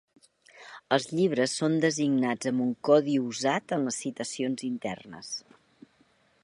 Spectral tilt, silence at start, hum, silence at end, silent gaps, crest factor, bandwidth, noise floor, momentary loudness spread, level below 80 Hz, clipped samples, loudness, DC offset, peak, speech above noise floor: -4.5 dB/octave; 0.55 s; none; 1.05 s; none; 22 dB; 11.5 kHz; -65 dBFS; 14 LU; -74 dBFS; under 0.1%; -28 LUFS; under 0.1%; -8 dBFS; 38 dB